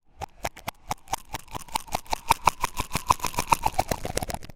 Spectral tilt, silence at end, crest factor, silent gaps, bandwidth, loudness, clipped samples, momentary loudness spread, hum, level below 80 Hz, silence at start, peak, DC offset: -3 dB/octave; 0 s; 28 dB; none; 17 kHz; -28 LUFS; under 0.1%; 13 LU; none; -40 dBFS; 0.2 s; 0 dBFS; under 0.1%